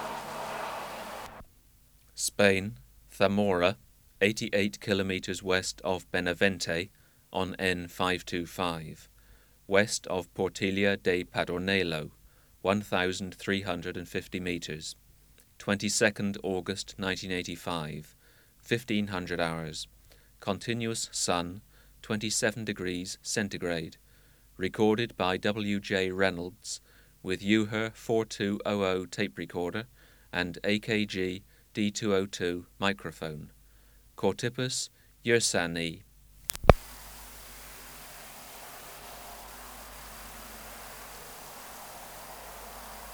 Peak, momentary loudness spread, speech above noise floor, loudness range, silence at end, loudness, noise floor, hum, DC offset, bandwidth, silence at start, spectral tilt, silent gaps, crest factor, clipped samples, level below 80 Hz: 0 dBFS; 17 LU; 30 dB; 5 LU; 0 s; -31 LUFS; -60 dBFS; none; under 0.1%; over 20 kHz; 0 s; -4 dB/octave; none; 32 dB; under 0.1%; -50 dBFS